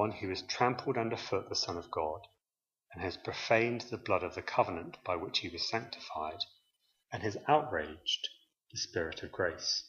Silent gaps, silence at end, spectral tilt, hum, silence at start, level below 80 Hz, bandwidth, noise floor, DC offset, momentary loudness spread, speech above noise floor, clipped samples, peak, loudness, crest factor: none; 0 s; -3.5 dB/octave; none; 0 s; -64 dBFS; 7.4 kHz; under -90 dBFS; under 0.1%; 11 LU; over 55 dB; under 0.1%; -12 dBFS; -35 LUFS; 22 dB